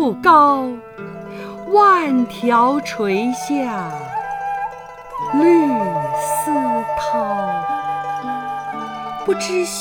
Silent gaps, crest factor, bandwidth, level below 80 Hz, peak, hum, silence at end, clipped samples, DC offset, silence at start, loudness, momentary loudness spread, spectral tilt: none; 18 dB; 20 kHz; -54 dBFS; 0 dBFS; 50 Hz at -55 dBFS; 0 s; under 0.1%; under 0.1%; 0 s; -18 LUFS; 16 LU; -4.5 dB/octave